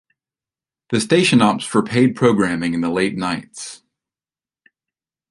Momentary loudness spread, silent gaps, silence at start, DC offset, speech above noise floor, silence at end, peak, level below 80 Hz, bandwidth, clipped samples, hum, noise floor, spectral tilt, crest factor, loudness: 13 LU; none; 0.9 s; under 0.1%; over 73 dB; 1.55 s; -2 dBFS; -54 dBFS; 11.5 kHz; under 0.1%; none; under -90 dBFS; -5 dB/octave; 18 dB; -17 LUFS